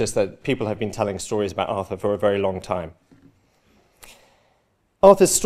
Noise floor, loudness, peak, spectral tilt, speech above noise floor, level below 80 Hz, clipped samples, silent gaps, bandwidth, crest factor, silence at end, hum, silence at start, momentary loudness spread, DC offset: -66 dBFS; -21 LUFS; 0 dBFS; -4.5 dB/octave; 45 dB; -50 dBFS; under 0.1%; none; 15.5 kHz; 22 dB; 0 s; none; 0 s; 13 LU; under 0.1%